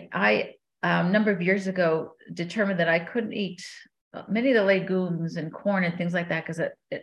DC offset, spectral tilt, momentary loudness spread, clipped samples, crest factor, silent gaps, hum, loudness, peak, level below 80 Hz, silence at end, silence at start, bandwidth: under 0.1%; -6.5 dB/octave; 12 LU; under 0.1%; 18 dB; 4.01-4.11 s; none; -25 LUFS; -8 dBFS; -72 dBFS; 0 s; 0 s; 10.5 kHz